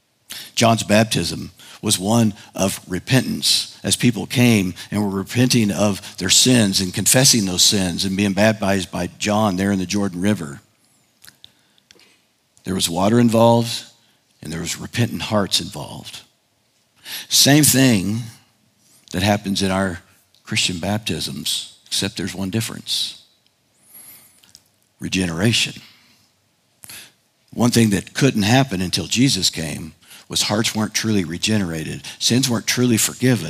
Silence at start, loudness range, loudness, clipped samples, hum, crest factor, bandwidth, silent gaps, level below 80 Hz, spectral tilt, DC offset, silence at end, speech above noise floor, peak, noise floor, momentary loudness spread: 0.3 s; 9 LU; -18 LUFS; under 0.1%; none; 18 dB; 16 kHz; none; -58 dBFS; -3.5 dB/octave; under 0.1%; 0 s; 44 dB; 0 dBFS; -63 dBFS; 16 LU